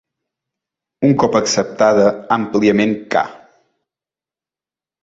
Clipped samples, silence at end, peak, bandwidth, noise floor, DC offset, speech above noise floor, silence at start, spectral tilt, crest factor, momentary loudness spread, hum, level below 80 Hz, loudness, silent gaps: under 0.1%; 1.65 s; -2 dBFS; 8 kHz; under -90 dBFS; under 0.1%; over 76 dB; 1 s; -5 dB/octave; 16 dB; 7 LU; none; -56 dBFS; -15 LUFS; none